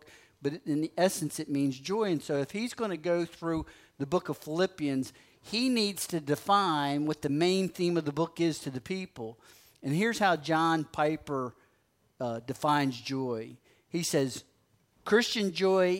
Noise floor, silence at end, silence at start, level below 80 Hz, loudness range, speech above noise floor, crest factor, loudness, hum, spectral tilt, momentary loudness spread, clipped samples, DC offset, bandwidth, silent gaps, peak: -71 dBFS; 0 s; 0.4 s; -64 dBFS; 4 LU; 41 dB; 18 dB; -30 LUFS; none; -5 dB/octave; 11 LU; under 0.1%; under 0.1%; 16 kHz; none; -12 dBFS